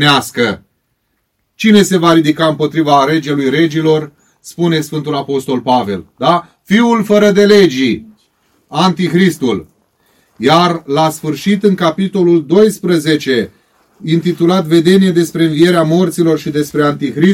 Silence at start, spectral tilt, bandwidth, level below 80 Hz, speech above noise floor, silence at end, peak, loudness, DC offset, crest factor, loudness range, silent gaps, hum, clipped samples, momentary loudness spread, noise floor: 0 s; -6 dB/octave; 16.5 kHz; -54 dBFS; 54 dB; 0 s; 0 dBFS; -12 LUFS; under 0.1%; 12 dB; 3 LU; none; none; 0.6%; 8 LU; -65 dBFS